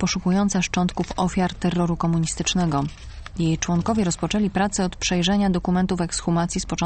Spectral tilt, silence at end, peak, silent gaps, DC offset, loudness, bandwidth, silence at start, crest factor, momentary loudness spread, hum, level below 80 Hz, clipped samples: -5 dB/octave; 0 s; -6 dBFS; none; under 0.1%; -22 LUFS; 8.8 kHz; 0 s; 16 dB; 4 LU; none; -38 dBFS; under 0.1%